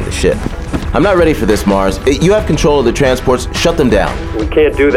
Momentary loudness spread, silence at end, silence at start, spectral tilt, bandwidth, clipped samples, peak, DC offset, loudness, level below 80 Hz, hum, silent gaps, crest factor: 7 LU; 0 s; 0 s; -5.5 dB/octave; 16 kHz; under 0.1%; 0 dBFS; under 0.1%; -12 LUFS; -22 dBFS; none; none; 10 dB